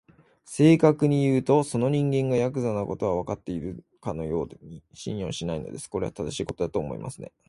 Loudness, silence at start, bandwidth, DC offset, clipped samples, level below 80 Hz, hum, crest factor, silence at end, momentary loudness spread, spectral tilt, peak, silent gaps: -26 LUFS; 0.5 s; 11.5 kHz; under 0.1%; under 0.1%; -52 dBFS; none; 20 dB; 0.25 s; 17 LU; -7 dB/octave; -6 dBFS; none